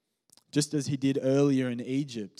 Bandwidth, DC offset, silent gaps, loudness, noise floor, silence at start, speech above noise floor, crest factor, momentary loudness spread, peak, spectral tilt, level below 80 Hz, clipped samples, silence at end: 13.5 kHz; under 0.1%; none; -28 LUFS; -65 dBFS; 0.55 s; 37 dB; 16 dB; 8 LU; -14 dBFS; -6 dB/octave; -80 dBFS; under 0.1%; 0.1 s